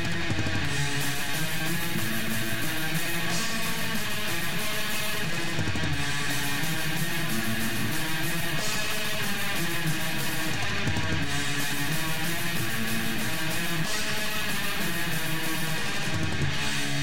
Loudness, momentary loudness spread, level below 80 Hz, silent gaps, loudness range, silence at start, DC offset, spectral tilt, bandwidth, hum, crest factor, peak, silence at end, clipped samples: -28 LUFS; 1 LU; -46 dBFS; none; 0 LU; 0 s; 4%; -3 dB/octave; 17 kHz; none; 16 dB; -14 dBFS; 0 s; under 0.1%